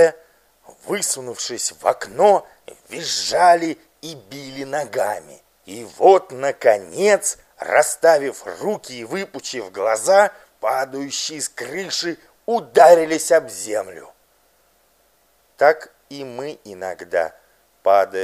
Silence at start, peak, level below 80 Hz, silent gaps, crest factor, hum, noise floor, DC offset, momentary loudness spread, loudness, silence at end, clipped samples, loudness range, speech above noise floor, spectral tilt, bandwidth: 0 s; 0 dBFS; -66 dBFS; none; 20 dB; none; -60 dBFS; under 0.1%; 18 LU; -19 LUFS; 0 s; under 0.1%; 6 LU; 41 dB; -2.5 dB/octave; 15.5 kHz